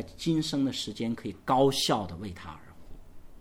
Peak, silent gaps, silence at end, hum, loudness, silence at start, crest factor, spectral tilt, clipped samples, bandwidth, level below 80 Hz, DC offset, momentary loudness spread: -10 dBFS; none; 0 s; none; -29 LUFS; 0 s; 20 dB; -5 dB/octave; under 0.1%; 17 kHz; -52 dBFS; under 0.1%; 18 LU